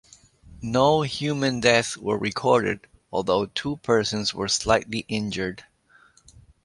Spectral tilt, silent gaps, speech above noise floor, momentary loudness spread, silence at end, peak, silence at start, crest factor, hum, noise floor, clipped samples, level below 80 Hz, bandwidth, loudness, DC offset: -4 dB/octave; none; 34 dB; 10 LU; 1.05 s; -2 dBFS; 0.45 s; 22 dB; none; -57 dBFS; under 0.1%; -52 dBFS; 11.5 kHz; -24 LUFS; under 0.1%